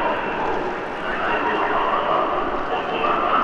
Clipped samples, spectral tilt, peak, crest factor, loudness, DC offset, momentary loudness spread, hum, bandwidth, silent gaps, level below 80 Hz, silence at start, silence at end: under 0.1%; -5.5 dB/octave; -6 dBFS; 16 dB; -22 LUFS; under 0.1%; 5 LU; none; 9.6 kHz; none; -44 dBFS; 0 s; 0 s